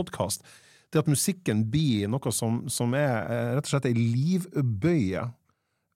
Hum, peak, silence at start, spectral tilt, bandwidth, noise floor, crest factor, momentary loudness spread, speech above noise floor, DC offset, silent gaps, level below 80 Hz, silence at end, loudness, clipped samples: none; -12 dBFS; 0 s; -5.5 dB/octave; 16.5 kHz; -74 dBFS; 16 dB; 5 LU; 48 dB; under 0.1%; none; -62 dBFS; 0.65 s; -27 LUFS; under 0.1%